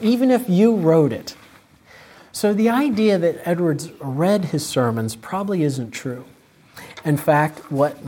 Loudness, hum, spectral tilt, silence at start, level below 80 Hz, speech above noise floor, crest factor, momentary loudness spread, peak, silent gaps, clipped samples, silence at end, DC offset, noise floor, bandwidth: -20 LUFS; none; -6.5 dB/octave; 0 s; -62 dBFS; 30 dB; 16 dB; 13 LU; -4 dBFS; none; under 0.1%; 0 s; under 0.1%; -49 dBFS; 17 kHz